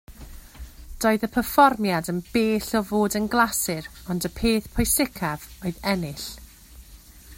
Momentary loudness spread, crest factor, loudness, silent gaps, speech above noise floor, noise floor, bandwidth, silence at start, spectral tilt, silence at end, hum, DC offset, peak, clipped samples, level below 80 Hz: 16 LU; 22 dB; -23 LUFS; none; 23 dB; -47 dBFS; 16.5 kHz; 0.1 s; -4 dB/octave; 0.05 s; none; under 0.1%; -4 dBFS; under 0.1%; -42 dBFS